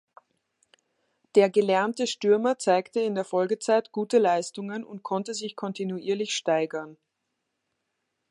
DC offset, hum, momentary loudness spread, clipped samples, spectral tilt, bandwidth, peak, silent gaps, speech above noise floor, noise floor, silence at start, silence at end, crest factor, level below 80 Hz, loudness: under 0.1%; none; 11 LU; under 0.1%; -4.5 dB/octave; 11.5 kHz; -8 dBFS; none; 55 dB; -80 dBFS; 1.35 s; 1.4 s; 20 dB; -82 dBFS; -26 LUFS